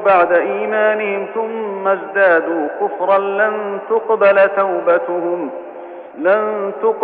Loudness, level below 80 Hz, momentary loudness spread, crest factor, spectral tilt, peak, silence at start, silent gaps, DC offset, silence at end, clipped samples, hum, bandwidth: -16 LUFS; -66 dBFS; 10 LU; 14 dB; -9.5 dB/octave; 0 dBFS; 0 s; none; under 0.1%; 0 s; under 0.1%; none; 4.4 kHz